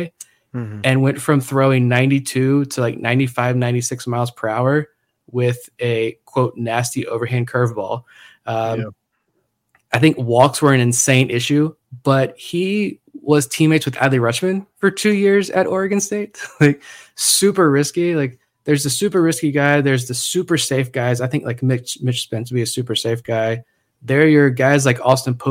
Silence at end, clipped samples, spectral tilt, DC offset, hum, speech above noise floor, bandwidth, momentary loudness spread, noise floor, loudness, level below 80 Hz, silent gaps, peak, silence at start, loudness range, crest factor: 0 s; under 0.1%; -5 dB/octave; under 0.1%; none; 52 dB; 16.5 kHz; 10 LU; -69 dBFS; -17 LUFS; -60 dBFS; none; 0 dBFS; 0 s; 5 LU; 18 dB